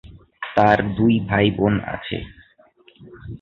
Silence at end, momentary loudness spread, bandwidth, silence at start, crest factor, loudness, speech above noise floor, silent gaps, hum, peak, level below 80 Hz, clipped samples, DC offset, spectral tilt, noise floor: 0.05 s; 20 LU; 6.6 kHz; 0.05 s; 20 dB; -19 LUFS; 35 dB; none; none; -2 dBFS; -44 dBFS; under 0.1%; under 0.1%; -8.5 dB/octave; -54 dBFS